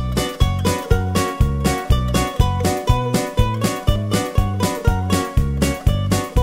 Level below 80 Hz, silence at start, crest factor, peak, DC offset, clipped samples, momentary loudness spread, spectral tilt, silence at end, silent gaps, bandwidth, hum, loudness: -24 dBFS; 0 s; 16 dB; -2 dBFS; under 0.1%; under 0.1%; 2 LU; -5.5 dB/octave; 0 s; none; 16.5 kHz; none; -19 LUFS